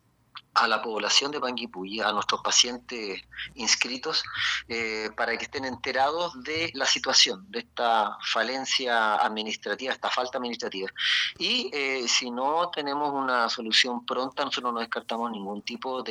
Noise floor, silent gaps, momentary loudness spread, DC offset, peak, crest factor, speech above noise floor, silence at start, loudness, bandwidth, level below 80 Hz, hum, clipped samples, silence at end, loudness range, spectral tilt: -50 dBFS; none; 11 LU; under 0.1%; -4 dBFS; 24 dB; 23 dB; 0.35 s; -26 LUFS; 13 kHz; -66 dBFS; none; under 0.1%; 0 s; 3 LU; -0.5 dB/octave